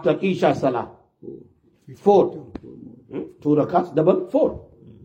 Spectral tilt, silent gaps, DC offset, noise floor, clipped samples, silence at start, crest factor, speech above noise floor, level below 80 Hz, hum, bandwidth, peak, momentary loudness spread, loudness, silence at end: -8 dB/octave; none; under 0.1%; -51 dBFS; under 0.1%; 0 s; 18 dB; 31 dB; -56 dBFS; none; 8.8 kHz; -2 dBFS; 22 LU; -20 LUFS; 0.15 s